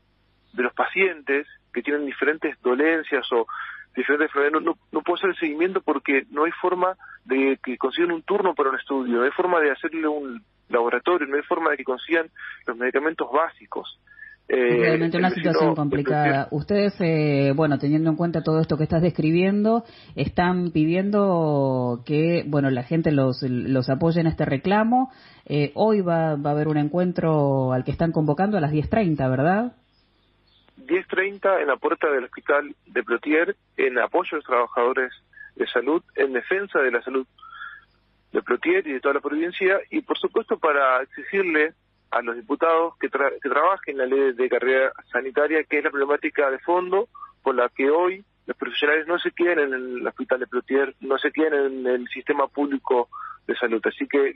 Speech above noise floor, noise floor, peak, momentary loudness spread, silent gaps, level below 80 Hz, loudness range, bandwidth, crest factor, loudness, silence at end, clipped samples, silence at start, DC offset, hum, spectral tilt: 41 dB; -63 dBFS; -6 dBFS; 7 LU; none; -54 dBFS; 3 LU; 5.8 kHz; 18 dB; -23 LUFS; 0.05 s; under 0.1%; 0.55 s; under 0.1%; none; -5 dB/octave